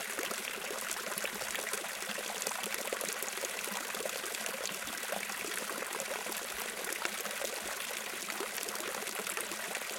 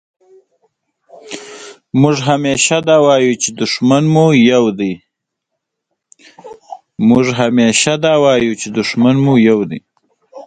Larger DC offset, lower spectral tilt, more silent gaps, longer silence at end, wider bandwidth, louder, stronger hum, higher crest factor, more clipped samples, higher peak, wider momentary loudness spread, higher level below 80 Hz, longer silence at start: neither; second, 0 dB/octave vs -5 dB/octave; neither; about the same, 0 s vs 0.05 s; first, 17 kHz vs 9.6 kHz; second, -36 LUFS vs -12 LUFS; neither; first, 28 dB vs 14 dB; neither; second, -12 dBFS vs 0 dBFS; second, 2 LU vs 19 LU; second, -74 dBFS vs -52 dBFS; second, 0 s vs 1.25 s